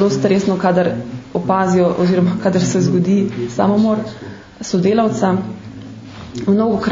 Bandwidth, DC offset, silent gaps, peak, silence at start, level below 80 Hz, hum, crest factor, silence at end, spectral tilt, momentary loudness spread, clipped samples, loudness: 7.6 kHz; under 0.1%; none; 0 dBFS; 0 s; -48 dBFS; none; 16 dB; 0 s; -7 dB/octave; 17 LU; under 0.1%; -16 LUFS